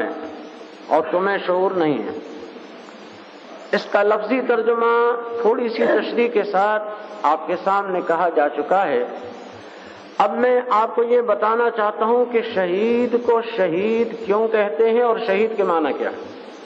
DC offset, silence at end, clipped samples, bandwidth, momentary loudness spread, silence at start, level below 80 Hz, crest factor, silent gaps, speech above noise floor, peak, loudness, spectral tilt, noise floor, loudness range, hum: under 0.1%; 0 s; under 0.1%; 7.6 kHz; 19 LU; 0 s; -76 dBFS; 16 dB; none; 21 dB; -4 dBFS; -19 LUFS; -6.5 dB/octave; -40 dBFS; 4 LU; none